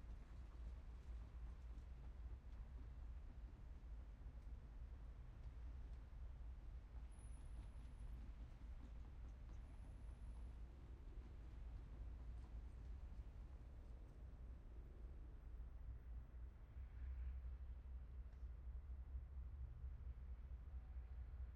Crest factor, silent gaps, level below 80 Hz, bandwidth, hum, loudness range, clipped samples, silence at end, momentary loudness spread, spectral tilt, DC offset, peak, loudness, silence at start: 12 dB; none; -56 dBFS; 11 kHz; none; 3 LU; under 0.1%; 0 s; 4 LU; -7.5 dB/octave; under 0.1%; -42 dBFS; -59 LUFS; 0 s